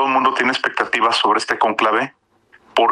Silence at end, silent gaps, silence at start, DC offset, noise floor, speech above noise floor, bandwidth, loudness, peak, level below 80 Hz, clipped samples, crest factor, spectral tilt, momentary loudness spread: 0 s; none; 0 s; under 0.1%; -54 dBFS; 36 dB; 13 kHz; -17 LUFS; -4 dBFS; -64 dBFS; under 0.1%; 14 dB; -2.5 dB/octave; 5 LU